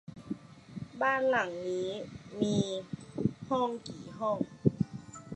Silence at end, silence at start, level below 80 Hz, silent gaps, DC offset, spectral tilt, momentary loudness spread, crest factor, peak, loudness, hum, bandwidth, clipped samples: 0 s; 0.1 s; -62 dBFS; none; under 0.1%; -6 dB/octave; 15 LU; 24 dB; -10 dBFS; -33 LUFS; none; 10 kHz; under 0.1%